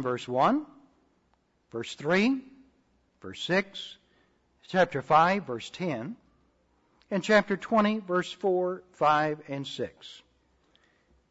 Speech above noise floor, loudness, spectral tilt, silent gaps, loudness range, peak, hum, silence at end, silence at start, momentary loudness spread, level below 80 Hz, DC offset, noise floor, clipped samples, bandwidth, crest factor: 43 dB; -28 LUFS; -5.5 dB/octave; none; 4 LU; -8 dBFS; none; 1.15 s; 0 s; 18 LU; -70 dBFS; under 0.1%; -70 dBFS; under 0.1%; 8 kHz; 22 dB